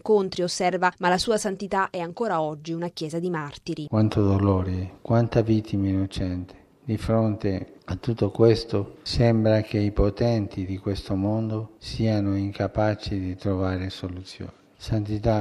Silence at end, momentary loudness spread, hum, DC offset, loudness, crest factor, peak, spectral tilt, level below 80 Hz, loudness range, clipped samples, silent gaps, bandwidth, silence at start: 0 s; 11 LU; none; under 0.1%; -25 LUFS; 20 dB; -4 dBFS; -6.5 dB/octave; -42 dBFS; 4 LU; under 0.1%; none; 12 kHz; 0.05 s